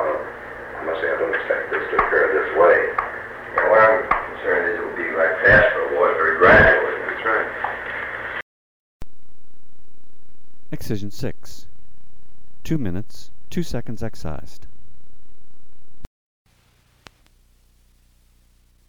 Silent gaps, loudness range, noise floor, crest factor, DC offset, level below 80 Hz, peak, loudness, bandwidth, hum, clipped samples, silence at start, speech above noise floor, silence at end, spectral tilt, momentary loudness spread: 8.42-9.00 s, 16.07-16.45 s; 19 LU; -59 dBFS; 18 dB; under 0.1%; -42 dBFS; -4 dBFS; -19 LUFS; 18 kHz; none; under 0.1%; 0 s; 36 dB; 0 s; -6 dB/octave; 19 LU